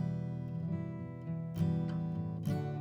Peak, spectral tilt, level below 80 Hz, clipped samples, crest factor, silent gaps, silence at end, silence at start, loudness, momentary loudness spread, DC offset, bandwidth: -22 dBFS; -9.5 dB/octave; -62 dBFS; under 0.1%; 14 dB; none; 0 s; 0 s; -38 LUFS; 7 LU; under 0.1%; 12.5 kHz